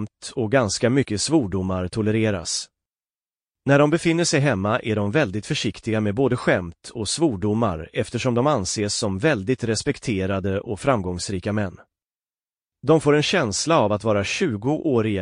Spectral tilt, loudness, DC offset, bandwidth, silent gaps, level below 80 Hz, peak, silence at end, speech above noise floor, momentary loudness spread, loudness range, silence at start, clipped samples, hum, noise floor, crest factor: -5 dB/octave; -22 LUFS; under 0.1%; 10.5 kHz; none; -50 dBFS; -6 dBFS; 0 s; over 69 dB; 8 LU; 3 LU; 0 s; under 0.1%; none; under -90 dBFS; 16 dB